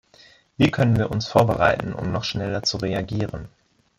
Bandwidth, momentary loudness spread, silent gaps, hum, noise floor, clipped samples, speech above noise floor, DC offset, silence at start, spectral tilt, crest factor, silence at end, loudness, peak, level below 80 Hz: 14.5 kHz; 9 LU; none; none; -53 dBFS; under 0.1%; 31 dB; under 0.1%; 0.6 s; -6 dB/octave; 20 dB; 0.5 s; -22 LUFS; -4 dBFS; -46 dBFS